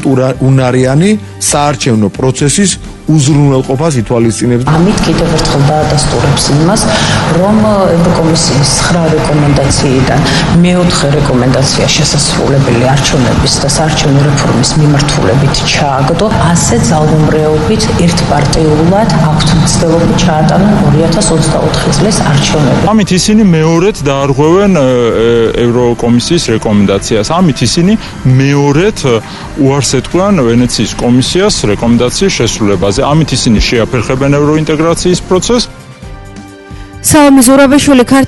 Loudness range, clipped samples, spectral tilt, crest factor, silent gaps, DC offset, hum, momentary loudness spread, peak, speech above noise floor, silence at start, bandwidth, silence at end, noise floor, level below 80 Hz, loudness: 2 LU; 0.3%; -5 dB/octave; 8 dB; none; under 0.1%; none; 3 LU; 0 dBFS; 20 dB; 0 s; 12 kHz; 0 s; -28 dBFS; -24 dBFS; -8 LUFS